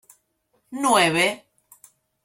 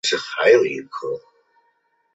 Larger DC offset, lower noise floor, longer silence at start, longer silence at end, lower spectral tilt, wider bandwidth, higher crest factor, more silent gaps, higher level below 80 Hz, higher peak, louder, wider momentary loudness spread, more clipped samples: neither; first, -70 dBFS vs -66 dBFS; first, 0.7 s vs 0.05 s; about the same, 0.9 s vs 0.95 s; about the same, -3 dB/octave vs -2.5 dB/octave; first, 16.5 kHz vs 8 kHz; about the same, 20 dB vs 18 dB; neither; about the same, -66 dBFS vs -70 dBFS; second, -6 dBFS vs -2 dBFS; about the same, -20 LUFS vs -19 LUFS; first, 21 LU vs 15 LU; neither